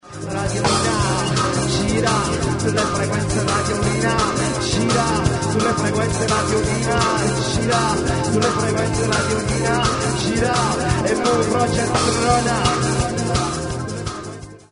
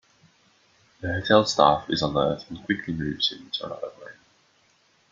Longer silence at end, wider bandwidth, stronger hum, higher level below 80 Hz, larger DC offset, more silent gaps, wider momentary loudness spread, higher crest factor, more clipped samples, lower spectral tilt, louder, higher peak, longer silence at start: second, 0.15 s vs 1 s; first, 11 kHz vs 7.6 kHz; neither; first, -34 dBFS vs -54 dBFS; neither; neither; second, 3 LU vs 16 LU; second, 16 dB vs 24 dB; neither; about the same, -4.5 dB/octave vs -4.5 dB/octave; first, -19 LUFS vs -24 LUFS; about the same, -2 dBFS vs -2 dBFS; second, 0.05 s vs 1 s